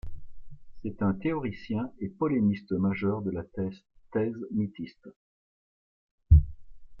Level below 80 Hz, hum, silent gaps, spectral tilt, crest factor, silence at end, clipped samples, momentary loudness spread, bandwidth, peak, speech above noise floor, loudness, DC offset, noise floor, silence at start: -36 dBFS; none; 5.16-6.18 s; -11 dB/octave; 22 dB; 0 s; under 0.1%; 17 LU; 5.6 kHz; -6 dBFS; over 60 dB; -29 LUFS; under 0.1%; under -90 dBFS; 0.05 s